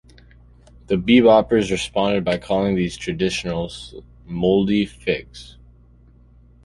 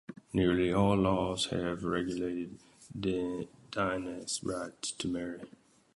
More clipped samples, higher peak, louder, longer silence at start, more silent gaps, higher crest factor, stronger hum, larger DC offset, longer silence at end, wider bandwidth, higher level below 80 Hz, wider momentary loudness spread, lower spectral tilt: neither; first, -2 dBFS vs -14 dBFS; first, -19 LUFS vs -33 LUFS; first, 0.9 s vs 0.1 s; neither; about the same, 20 dB vs 18 dB; first, 60 Hz at -45 dBFS vs none; neither; first, 1.2 s vs 0.5 s; about the same, 11.5 kHz vs 11.5 kHz; first, -44 dBFS vs -54 dBFS; first, 17 LU vs 13 LU; about the same, -6 dB/octave vs -5 dB/octave